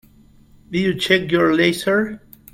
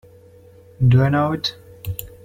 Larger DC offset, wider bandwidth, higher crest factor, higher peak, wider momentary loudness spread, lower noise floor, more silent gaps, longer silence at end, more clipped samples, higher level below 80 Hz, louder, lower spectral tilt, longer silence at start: neither; about the same, 16.5 kHz vs 15 kHz; about the same, 20 dB vs 16 dB; first, 0 dBFS vs -4 dBFS; second, 11 LU vs 15 LU; about the same, -50 dBFS vs -47 dBFS; neither; first, 0.35 s vs 0.15 s; neither; second, -52 dBFS vs -44 dBFS; about the same, -18 LUFS vs -19 LUFS; second, -5 dB/octave vs -7 dB/octave; about the same, 0.7 s vs 0.8 s